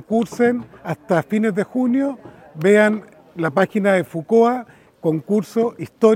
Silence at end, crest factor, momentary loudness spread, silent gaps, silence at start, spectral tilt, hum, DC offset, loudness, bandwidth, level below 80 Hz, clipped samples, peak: 0 s; 18 dB; 12 LU; none; 0.1 s; -7 dB/octave; none; under 0.1%; -19 LUFS; 16 kHz; -64 dBFS; under 0.1%; -2 dBFS